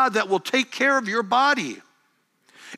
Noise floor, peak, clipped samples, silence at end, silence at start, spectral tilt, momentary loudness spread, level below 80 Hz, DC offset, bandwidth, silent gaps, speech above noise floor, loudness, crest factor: -67 dBFS; -8 dBFS; under 0.1%; 0 s; 0 s; -3 dB/octave; 8 LU; -86 dBFS; under 0.1%; 15 kHz; none; 45 dB; -21 LUFS; 16 dB